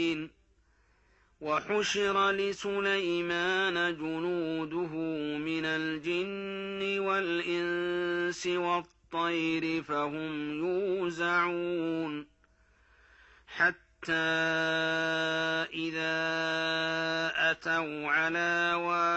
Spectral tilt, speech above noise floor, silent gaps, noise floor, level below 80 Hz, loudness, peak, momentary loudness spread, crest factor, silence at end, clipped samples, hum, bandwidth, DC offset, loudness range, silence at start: -4 dB/octave; 36 dB; none; -67 dBFS; -68 dBFS; -30 LUFS; -14 dBFS; 6 LU; 16 dB; 0 s; under 0.1%; none; 8.4 kHz; under 0.1%; 3 LU; 0 s